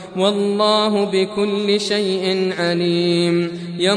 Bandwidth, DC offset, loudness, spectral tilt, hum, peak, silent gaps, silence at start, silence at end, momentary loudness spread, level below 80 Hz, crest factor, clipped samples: 10.5 kHz; under 0.1%; -18 LUFS; -5 dB/octave; none; -4 dBFS; none; 0 s; 0 s; 4 LU; -62 dBFS; 14 dB; under 0.1%